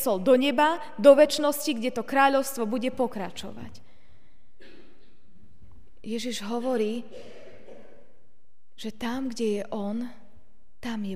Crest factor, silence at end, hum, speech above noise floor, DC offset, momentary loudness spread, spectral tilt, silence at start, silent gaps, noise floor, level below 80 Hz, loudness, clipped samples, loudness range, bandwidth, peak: 24 dB; 0 s; none; 47 dB; 1%; 20 LU; -4 dB/octave; 0 s; none; -72 dBFS; -62 dBFS; -25 LUFS; under 0.1%; 14 LU; 15.5 kHz; -4 dBFS